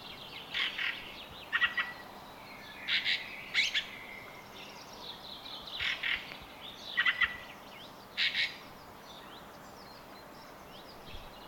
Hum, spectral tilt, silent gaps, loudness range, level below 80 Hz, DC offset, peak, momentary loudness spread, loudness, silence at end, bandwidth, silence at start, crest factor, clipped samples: none; -1 dB/octave; none; 5 LU; -64 dBFS; under 0.1%; -14 dBFS; 20 LU; -33 LUFS; 0 s; 18 kHz; 0 s; 24 dB; under 0.1%